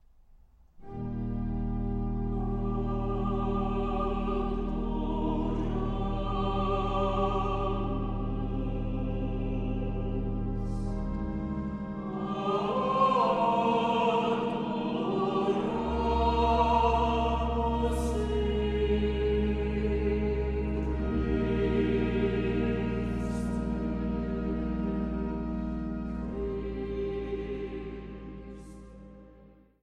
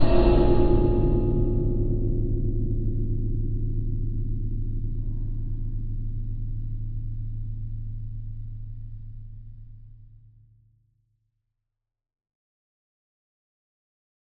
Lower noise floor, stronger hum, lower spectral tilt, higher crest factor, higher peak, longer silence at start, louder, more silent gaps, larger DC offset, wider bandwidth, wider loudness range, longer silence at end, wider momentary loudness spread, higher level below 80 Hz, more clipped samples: second, -57 dBFS vs -85 dBFS; neither; about the same, -8 dB/octave vs -9 dB/octave; about the same, 16 dB vs 20 dB; second, -14 dBFS vs -6 dBFS; first, 0.8 s vs 0 s; about the same, -30 LUFS vs -28 LUFS; neither; neither; first, 11 kHz vs 4.8 kHz; second, 6 LU vs 19 LU; second, 0.35 s vs 4.1 s; second, 9 LU vs 19 LU; second, -36 dBFS vs -28 dBFS; neither